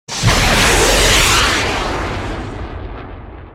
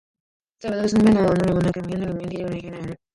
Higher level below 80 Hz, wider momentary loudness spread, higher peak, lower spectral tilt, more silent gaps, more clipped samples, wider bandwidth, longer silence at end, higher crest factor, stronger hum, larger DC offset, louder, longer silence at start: first, -24 dBFS vs -46 dBFS; first, 20 LU vs 16 LU; first, 0 dBFS vs -6 dBFS; second, -2.5 dB/octave vs -7.5 dB/octave; neither; neither; first, 17 kHz vs 11.5 kHz; second, 0 s vs 0.2 s; about the same, 14 dB vs 16 dB; neither; neither; first, -12 LUFS vs -21 LUFS; second, 0.1 s vs 0.6 s